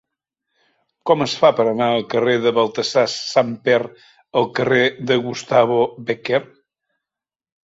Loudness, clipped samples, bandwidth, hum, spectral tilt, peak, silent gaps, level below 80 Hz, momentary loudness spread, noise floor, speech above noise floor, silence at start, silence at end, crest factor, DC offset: -18 LUFS; under 0.1%; 8 kHz; none; -4.5 dB/octave; -2 dBFS; none; -62 dBFS; 6 LU; -89 dBFS; 71 dB; 1.05 s; 1.2 s; 18 dB; under 0.1%